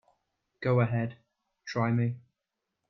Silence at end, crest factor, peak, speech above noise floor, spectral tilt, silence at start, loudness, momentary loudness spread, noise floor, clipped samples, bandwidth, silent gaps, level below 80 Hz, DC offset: 0.7 s; 18 dB; -14 dBFS; 58 dB; -8 dB/octave; 0.6 s; -30 LUFS; 14 LU; -86 dBFS; under 0.1%; 6.2 kHz; none; -68 dBFS; under 0.1%